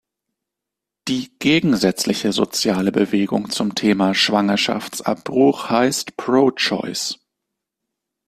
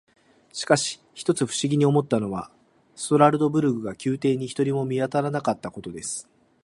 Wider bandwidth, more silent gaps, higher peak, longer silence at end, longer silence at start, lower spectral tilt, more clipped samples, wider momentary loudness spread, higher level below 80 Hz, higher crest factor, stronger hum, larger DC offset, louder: first, 14.5 kHz vs 11.5 kHz; neither; about the same, -2 dBFS vs -2 dBFS; first, 1.15 s vs 0.45 s; first, 1.05 s vs 0.55 s; second, -4 dB/octave vs -5.5 dB/octave; neither; second, 8 LU vs 15 LU; about the same, -58 dBFS vs -62 dBFS; about the same, 18 dB vs 22 dB; neither; neither; first, -19 LUFS vs -24 LUFS